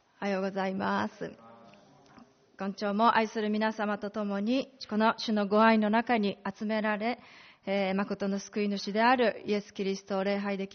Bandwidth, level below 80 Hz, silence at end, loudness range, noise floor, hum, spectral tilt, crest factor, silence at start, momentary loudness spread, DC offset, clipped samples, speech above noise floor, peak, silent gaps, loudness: 6.6 kHz; -72 dBFS; 0 s; 4 LU; -58 dBFS; none; -4 dB/octave; 18 dB; 0.2 s; 10 LU; under 0.1%; under 0.1%; 28 dB; -12 dBFS; none; -29 LUFS